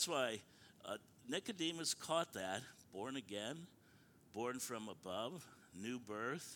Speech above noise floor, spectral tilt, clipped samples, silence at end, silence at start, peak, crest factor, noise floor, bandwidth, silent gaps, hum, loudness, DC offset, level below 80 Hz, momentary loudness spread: 23 dB; -3 dB/octave; under 0.1%; 0 s; 0 s; -22 dBFS; 22 dB; -68 dBFS; 19 kHz; none; none; -45 LUFS; under 0.1%; -84 dBFS; 14 LU